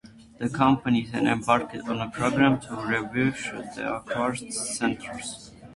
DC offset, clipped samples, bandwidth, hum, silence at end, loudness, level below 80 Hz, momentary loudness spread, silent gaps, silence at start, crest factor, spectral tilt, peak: under 0.1%; under 0.1%; 11.5 kHz; none; 0 s; -26 LUFS; -56 dBFS; 11 LU; none; 0.05 s; 20 dB; -5 dB/octave; -6 dBFS